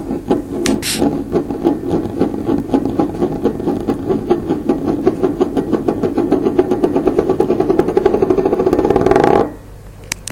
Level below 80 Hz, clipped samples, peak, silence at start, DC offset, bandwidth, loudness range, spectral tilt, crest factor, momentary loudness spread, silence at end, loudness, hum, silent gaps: -36 dBFS; under 0.1%; 0 dBFS; 0 s; under 0.1%; 16.5 kHz; 4 LU; -6 dB/octave; 16 dB; 5 LU; 0 s; -16 LUFS; none; none